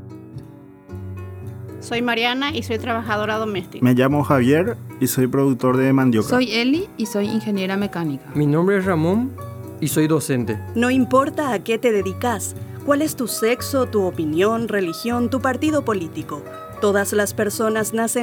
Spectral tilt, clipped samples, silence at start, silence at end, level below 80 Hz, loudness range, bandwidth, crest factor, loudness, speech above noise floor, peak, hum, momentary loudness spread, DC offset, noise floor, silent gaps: -5.5 dB/octave; under 0.1%; 0 s; 0 s; -56 dBFS; 3 LU; over 20 kHz; 18 dB; -20 LUFS; 22 dB; -2 dBFS; none; 15 LU; under 0.1%; -41 dBFS; none